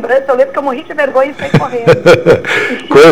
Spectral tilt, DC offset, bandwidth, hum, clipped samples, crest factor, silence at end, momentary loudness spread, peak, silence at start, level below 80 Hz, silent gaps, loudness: -6 dB/octave; 2%; 15 kHz; none; 3%; 8 dB; 0 s; 7 LU; 0 dBFS; 0 s; -40 dBFS; none; -10 LUFS